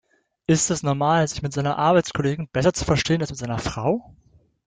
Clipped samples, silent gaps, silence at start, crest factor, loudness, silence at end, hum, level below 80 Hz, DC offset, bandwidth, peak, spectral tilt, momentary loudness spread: under 0.1%; none; 0.5 s; 16 dB; -22 LUFS; 0.65 s; none; -46 dBFS; under 0.1%; 9.6 kHz; -6 dBFS; -5 dB/octave; 8 LU